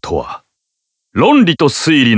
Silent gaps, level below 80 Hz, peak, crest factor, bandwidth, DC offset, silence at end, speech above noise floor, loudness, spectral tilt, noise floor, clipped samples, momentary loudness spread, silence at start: none; -40 dBFS; 0 dBFS; 12 dB; 8 kHz; under 0.1%; 0 s; 63 dB; -12 LUFS; -5 dB/octave; -74 dBFS; under 0.1%; 17 LU; 0.05 s